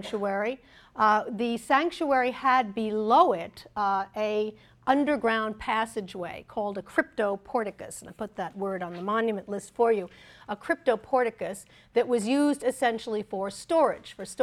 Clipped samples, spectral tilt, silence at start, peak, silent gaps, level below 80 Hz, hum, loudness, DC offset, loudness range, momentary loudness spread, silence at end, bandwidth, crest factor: under 0.1%; -4.5 dB/octave; 0 s; -8 dBFS; none; -62 dBFS; none; -27 LUFS; under 0.1%; 6 LU; 14 LU; 0 s; 14 kHz; 20 dB